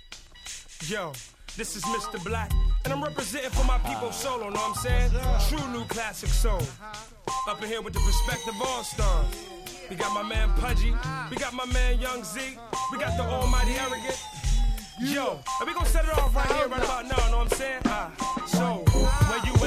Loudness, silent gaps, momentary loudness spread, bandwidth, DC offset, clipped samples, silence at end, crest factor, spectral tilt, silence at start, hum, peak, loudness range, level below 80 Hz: -28 LUFS; none; 9 LU; 15 kHz; under 0.1%; under 0.1%; 0 s; 18 dB; -4.5 dB/octave; 0.1 s; none; -8 dBFS; 3 LU; -28 dBFS